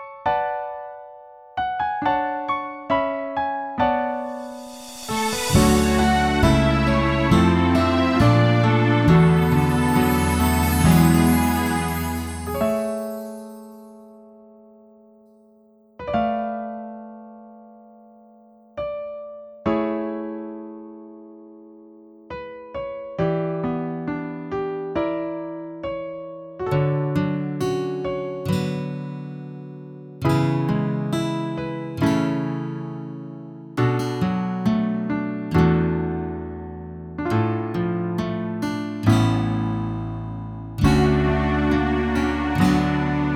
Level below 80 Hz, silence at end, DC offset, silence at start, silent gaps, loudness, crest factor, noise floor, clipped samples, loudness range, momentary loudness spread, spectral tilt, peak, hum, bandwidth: -36 dBFS; 0 s; under 0.1%; 0 s; none; -22 LUFS; 20 dB; -54 dBFS; under 0.1%; 13 LU; 18 LU; -6.5 dB/octave; -4 dBFS; none; 18.5 kHz